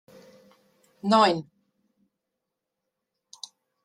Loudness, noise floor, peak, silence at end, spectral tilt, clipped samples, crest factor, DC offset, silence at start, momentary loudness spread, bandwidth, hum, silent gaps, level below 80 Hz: -23 LUFS; -84 dBFS; -6 dBFS; 2.4 s; -5 dB/octave; under 0.1%; 24 dB; under 0.1%; 1.05 s; 23 LU; 11.5 kHz; none; none; -74 dBFS